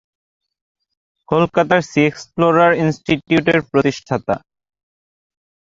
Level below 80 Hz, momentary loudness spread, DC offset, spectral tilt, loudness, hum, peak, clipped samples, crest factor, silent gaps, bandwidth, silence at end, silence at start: -52 dBFS; 8 LU; under 0.1%; -6.5 dB/octave; -16 LUFS; none; -2 dBFS; under 0.1%; 16 dB; none; 7.8 kHz; 1.2 s; 1.3 s